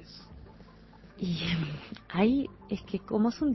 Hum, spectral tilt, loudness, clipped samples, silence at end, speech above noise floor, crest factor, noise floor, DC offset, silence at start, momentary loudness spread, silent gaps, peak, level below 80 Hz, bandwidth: none; -7.5 dB/octave; -31 LUFS; under 0.1%; 0 s; 23 dB; 18 dB; -53 dBFS; under 0.1%; 0 s; 22 LU; none; -14 dBFS; -54 dBFS; 6.2 kHz